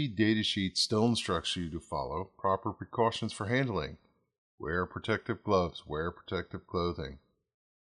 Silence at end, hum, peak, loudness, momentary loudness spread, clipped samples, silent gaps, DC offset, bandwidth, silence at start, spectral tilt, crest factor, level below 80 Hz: 0.65 s; none; -14 dBFS; -32 LUFS; 10 LU; under 0.1%; 4.38-4.58 s; under 0.1%; 11.5 kHz; 0 s; -5 dB/octave; 20 dB; -58 dBFS